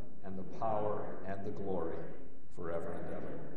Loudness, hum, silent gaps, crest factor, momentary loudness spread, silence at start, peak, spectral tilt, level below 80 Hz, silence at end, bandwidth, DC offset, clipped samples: -41 LUFS; none; none; 18 dB; 11 LU; 0 s; -20 dBFS; -9 dB/octave; -62 dBFS; 0 s; 10.5 kHz; 3%; under 0.1%